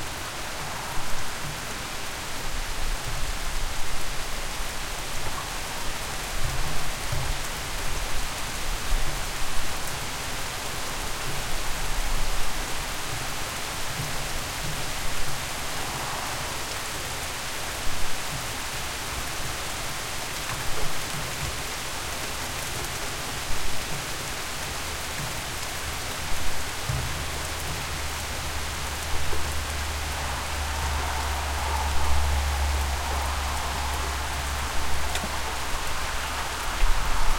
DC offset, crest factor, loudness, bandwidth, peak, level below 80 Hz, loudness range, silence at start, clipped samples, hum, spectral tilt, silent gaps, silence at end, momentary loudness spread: under 0.1%; 18 dB; -30 LUFS; 16.5 kHz; -8 dBFS; -32 dBFS; 4 LU; 0 s; under 0.1%; none; -2.5 dB/octave; none; 0 s; 4 LU